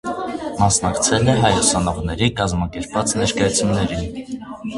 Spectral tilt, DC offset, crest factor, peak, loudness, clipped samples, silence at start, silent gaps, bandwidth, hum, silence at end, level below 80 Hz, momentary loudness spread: -4 dB/octave; under 0.1%; 18 dB; 0 dBFS; -18 LUFS; under 0.1%; 0.05 s; none; 11.5 kHz; none; 0 s; -36 dBFS; 11 LU